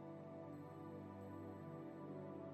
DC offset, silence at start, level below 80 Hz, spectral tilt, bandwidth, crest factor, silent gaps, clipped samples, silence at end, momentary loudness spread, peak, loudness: under 0.1%; 0 s; under -90 dBFS; -9 dB/octave; 13 kHz; 12 dB; none; under 0.1%; 0 s; 2 LU; -40 dBFS; -54 LUFS